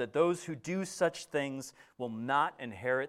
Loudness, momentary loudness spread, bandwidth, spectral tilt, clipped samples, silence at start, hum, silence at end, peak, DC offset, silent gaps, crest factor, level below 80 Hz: -34 LUFS; 11 LU; 14.5 kHz; -5 dB/octave; under 0.1%; 0 s; none; 0 s; -16 dBFS; under 0.1%; none; 18 dB; -76 dBFS